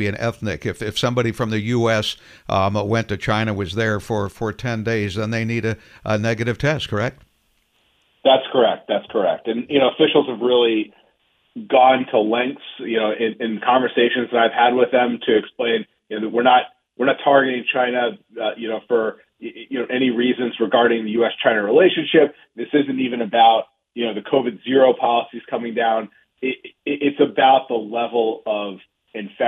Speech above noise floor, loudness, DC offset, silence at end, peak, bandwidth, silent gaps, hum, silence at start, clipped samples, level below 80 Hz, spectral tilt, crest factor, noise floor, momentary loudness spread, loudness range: 45 dB; -19 LUFS; under 0.1%; 0 s; -2 dBFS; 13.5 kHz; none; none; 0 s; under 0.1%; -54 dBFS; -6 dB/octave; 16 dB; -64 dBFS; 12 LU; 4 LU